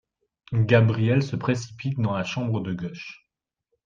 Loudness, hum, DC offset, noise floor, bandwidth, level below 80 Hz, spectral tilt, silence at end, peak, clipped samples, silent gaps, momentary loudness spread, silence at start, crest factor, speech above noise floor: -24 LUFS; none; under 0.1%; -79 dBFS; 7.4 kHz; -60 dBFS; -7 dB/octave; 0.7 s; -4 dBFS; under 0.1%; none; 14 LU; 0.5 s; 20 dB; 55 dB